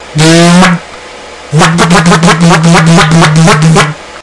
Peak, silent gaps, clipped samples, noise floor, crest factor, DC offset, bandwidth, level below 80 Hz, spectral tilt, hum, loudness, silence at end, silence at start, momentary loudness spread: 0 dBFS; none; 6%; -26 dBFS; 6 dB; 3%; 12 kHz; -30 dBFS; -5 dB/octave; none; -4 LUFS; 0 s; 0 s; 13 LU